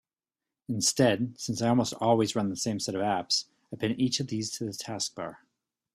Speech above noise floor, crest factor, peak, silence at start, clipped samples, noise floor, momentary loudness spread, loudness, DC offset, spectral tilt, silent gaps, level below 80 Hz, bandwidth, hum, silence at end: over 62 dB; 20 dB; -8 dBFS; 0.7 s; under 0.1%; under -90 dBFS; 10 LU; -28 LUFS; under 0.1%; -4 dB/octave; none; -66 dBFS; 14.5 kHz; none; 0.6 s